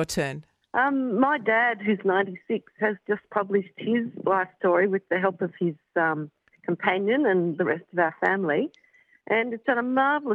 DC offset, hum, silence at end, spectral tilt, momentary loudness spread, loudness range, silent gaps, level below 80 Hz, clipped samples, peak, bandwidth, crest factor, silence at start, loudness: under 0.1%; none; 0 s; -6 dB/octave; 8 LU; 1 LU; none; -66 dBFS; under 0.1%; -8 dBFS; 11.5 kHz; 18 dB; 0 s; -25 LUFS